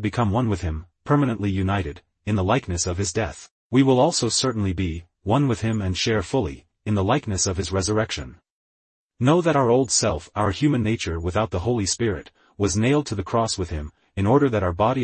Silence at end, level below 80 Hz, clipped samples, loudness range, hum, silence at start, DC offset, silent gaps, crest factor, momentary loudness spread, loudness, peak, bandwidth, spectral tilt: 0 s; -44 dBFS; under 0.1%; 2 LU; none; 0 s; under 0.1%; 3.51-3.70 s, 8.50-9.10 s; 16 dB; 12 LU; -22 LUFS; -6 dBFS; 8.8 kHz; -5 dB/octave